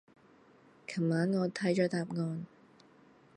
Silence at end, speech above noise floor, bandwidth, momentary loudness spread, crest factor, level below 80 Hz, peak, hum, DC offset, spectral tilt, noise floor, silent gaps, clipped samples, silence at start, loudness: 0.9 s; 30 dB; 10.5 kHz; 14 LU; 20 dB; -78 dBFS; -16 dBFS; none; under 0.1%; -7 dB/octave; -62 dBFS; none; under 0.1%; 0.9 s; -33 LUFS